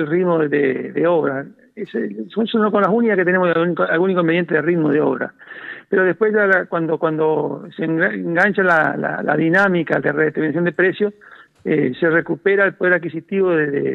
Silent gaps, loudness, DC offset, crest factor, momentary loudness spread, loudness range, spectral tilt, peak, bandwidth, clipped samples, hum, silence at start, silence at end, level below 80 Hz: none; -17 LUFS; under 0.1%; 14 dB; 10 LU; 2 LU; -8.5 dB/octave; -4 dBFS; 6.8 kHz; under 0.1%; none; 0 s; 0 s; -68 dBFS